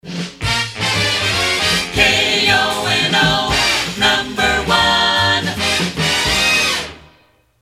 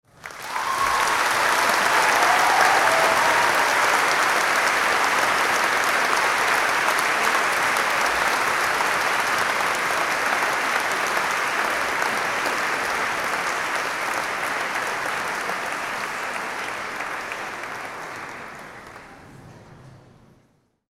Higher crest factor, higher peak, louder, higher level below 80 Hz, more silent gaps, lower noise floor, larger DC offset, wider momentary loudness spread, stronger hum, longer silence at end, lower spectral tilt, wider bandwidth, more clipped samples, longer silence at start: about the same, 16 dB vs 18 dB; first, 0 dBFS vs -4 dBFS; first, -14 LUFS vs -21 LUFS; first, -36 dBFS vs -58 dBFS; neither; second, -53 dBFS vs -62 dBFS; neither; second, 5 LU vs 12 LU; neither; second, 0.6 s vs 0.95 s; first, -2.5 dB/octave vs -1 dB/octave; about the same, 16.5 kHz vs 16.5 kHz; neither; second, 0.05 s vs 0.2 s